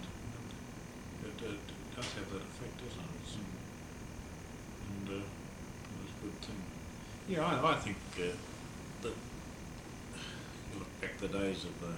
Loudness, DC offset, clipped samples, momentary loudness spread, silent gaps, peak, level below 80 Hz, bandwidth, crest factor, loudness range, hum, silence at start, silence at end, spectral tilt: -42 LUFS; under 0.1%; under 0.1%; 12 LU; none; -18 dBFS; -56 dBFS; over 20 kHz; 24 dB; 7 LU; none; 0 s; 0 s; -5 dB/octave